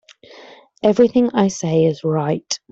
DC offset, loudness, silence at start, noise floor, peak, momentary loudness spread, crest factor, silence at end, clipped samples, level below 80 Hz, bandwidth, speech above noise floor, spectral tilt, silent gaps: under 0.1%; -17 LUFS; 0.35 s; -44 dBFS; -2 dBFS; 6 LU; 16 dB; 0.15 s; under 0.1%; -58 dBFS; 8 kHz; 27 dB; -6 dB/octave; none